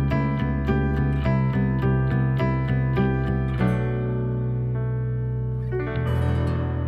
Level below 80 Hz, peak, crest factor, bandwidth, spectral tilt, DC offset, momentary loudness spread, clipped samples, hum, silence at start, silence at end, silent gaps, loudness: -32 dBFS; -10 dBFS; 14 dB; 5.2 kHz; -10 dB/octave; under 0.1%; 4 LU; under 0.1%; none; 0 s; 0 s; none; -24 LUFS